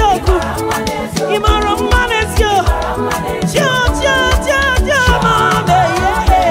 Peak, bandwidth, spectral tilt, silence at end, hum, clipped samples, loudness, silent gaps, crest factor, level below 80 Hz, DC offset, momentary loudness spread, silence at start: 0 dBFS; 16.5 kHz; -4.5 dB/octave; 0 s; none; under 0.1%; -13 LUFS; none; 12 dB; -20 dBFS; under 0.1%; 6 LU; 0 s